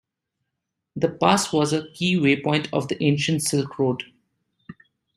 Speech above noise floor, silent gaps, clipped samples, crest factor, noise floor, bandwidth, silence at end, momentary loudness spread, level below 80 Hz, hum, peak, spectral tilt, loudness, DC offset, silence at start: 59 dB; none; under 0.1%; 22 dB; -81 dBFS; 14.5 kHz; 0.45 s; 7 LU; -62 dBFS; none; -2 dBFS; -5 dB/octave; -22 LUFS; under 0.1%; 0.95 s